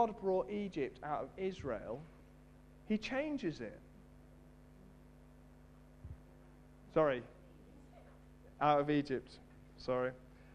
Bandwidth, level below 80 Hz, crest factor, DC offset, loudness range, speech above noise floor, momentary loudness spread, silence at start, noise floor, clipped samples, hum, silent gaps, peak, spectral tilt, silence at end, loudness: 11 kHz; -62 dBFS; 24 dB; under 0.1%; 10 LU; 23 dB; 26 LU; 0 s; -60 dBFS; under 0.1%; none; none; -16 dBFS; -7 dB/octave; 0 s; -38 LUFS